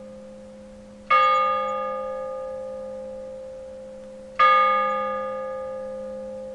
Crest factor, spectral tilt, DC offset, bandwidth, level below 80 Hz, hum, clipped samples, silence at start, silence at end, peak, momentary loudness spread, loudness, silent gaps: 18 dB; -4 dB/octave; under 0.1%; 10.5 kHz; -58 dBFS; none; under 0.1%; 0 s; 0 s; -8 dBFS; 24 LU; -23 LUFS; none